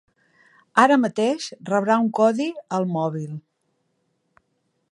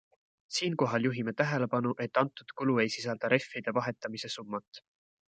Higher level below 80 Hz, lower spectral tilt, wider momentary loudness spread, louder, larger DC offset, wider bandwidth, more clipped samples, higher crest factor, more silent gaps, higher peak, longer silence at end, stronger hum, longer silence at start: about the same, -76 dBFS vs -76 dBFS; about the same, -6 dB/octave vs -5 dB/octave; first, 12 LU vs 9 LU; first, -21 LUFS vs -32 LUFS; neither; first, 11 kHz vs 9.2 kHz; neither; about the same, 22 dB vs 24 dB; second, none vs 4.68-4.72 s; first, -2 dBFS vs -8 dBFS; first, 1.55 s vs 0.6 s; neither; first, 0.75 s vs 0.5 s